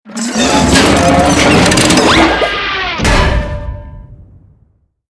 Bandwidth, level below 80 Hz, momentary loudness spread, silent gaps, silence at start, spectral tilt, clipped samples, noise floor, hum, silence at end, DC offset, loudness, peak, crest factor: 11 kHz; -22 dBFS; 11 LU; none; 0.05 s; -4 dB/octave; 0.2%; -53 dBFS; none; 0.9 s; under 0.1%; -9 LUFS; 0 dBFS; 12 dB